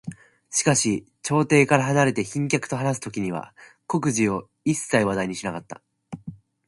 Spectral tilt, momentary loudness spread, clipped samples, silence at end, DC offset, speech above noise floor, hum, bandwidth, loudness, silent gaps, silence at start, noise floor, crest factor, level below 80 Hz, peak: -4.5 dB/octave; 20 LU; under 0.1%; 0.35 s; under 0.1%; 19 dB; none; 11.5 kHz; -23 LUFS; none; 0.05 s; -42 dBFS; 22 dB; -58 dBFS; -2 dBFS